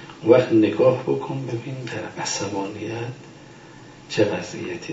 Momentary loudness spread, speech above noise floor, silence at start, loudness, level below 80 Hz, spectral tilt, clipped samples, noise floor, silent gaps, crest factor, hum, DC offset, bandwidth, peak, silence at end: 14 LU; 22 dB; 0 s; -22 LUFS; -62 dBFS; -5.5 dB/octave; under 0.1%; -44 dBFS; none; 22 dB; none; under 0.1%; 8 kHz; -2 dBFS; 0 s